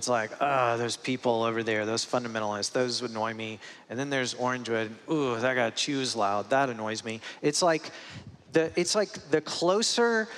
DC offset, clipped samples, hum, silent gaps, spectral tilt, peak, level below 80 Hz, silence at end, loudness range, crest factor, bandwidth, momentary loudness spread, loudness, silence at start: under 0.1%; under 0.1%; none; none; -3.5 dB/octave; -10 dBFS; -76 dBFS; 0 s; 2 LU; 18 dB; 13.5 kHz; 9 LU; -28 LUFS; 0 s